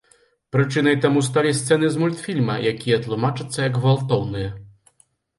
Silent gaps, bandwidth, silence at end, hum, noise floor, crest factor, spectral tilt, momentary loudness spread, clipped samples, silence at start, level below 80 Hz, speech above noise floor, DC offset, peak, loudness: none; 11.5 kHz; 0.7 s; none; -61 dBFS; 16 dB; -6 dB/octave; 6 LU; under 0.1%; 0.55 s; -52 dBFS; 41 dB; under 0.1%; -4 dBFS; -21 LUFS